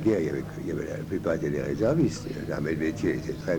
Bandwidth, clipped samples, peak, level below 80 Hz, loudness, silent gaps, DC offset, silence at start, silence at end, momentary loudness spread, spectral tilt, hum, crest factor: 19.5 kHz; under 0.1%; -12 dBFS; -48 dBFS; -28 LUFS; none; under 0.1%; 0 s; 0 s; 8 LU; -7 dB/octave; none; 16 dB